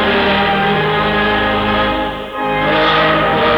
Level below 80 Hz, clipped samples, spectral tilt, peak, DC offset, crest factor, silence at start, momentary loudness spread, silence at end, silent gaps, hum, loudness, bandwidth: -34 dBFS; under 0.1%; -6.5 dB/octave; -2 dBFS; under 0.1%; 12 dB; 0 s; 7 LU; 0 s; none; none; -14 LUFS; over 20 kHz